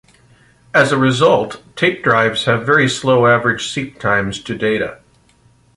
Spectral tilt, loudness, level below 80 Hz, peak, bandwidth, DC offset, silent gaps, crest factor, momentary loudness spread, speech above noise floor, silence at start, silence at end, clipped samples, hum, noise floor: -5 dB/octave; -15 LUFS; -50 dBFS; -2 dBFS; 11.5 kHz; under 0.1%; none; 14 dB; 9 LU; 38 dB; 0.75 s; 0.8 s; under 0.1%; none; -53 dBFS